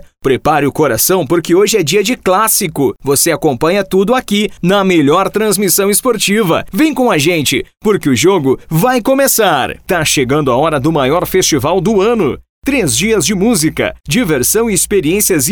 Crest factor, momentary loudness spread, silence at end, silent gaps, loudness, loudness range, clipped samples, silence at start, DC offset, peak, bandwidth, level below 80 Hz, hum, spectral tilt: 12 dB; 5 LU; 0 s; 12.49-12.62 s; -11 LUFS; 1 LU; under 0.1%; 0.25 s; 0.1%; 0 dBFS; over 20 kHz; -38 dBFS; none; -4 dB/octave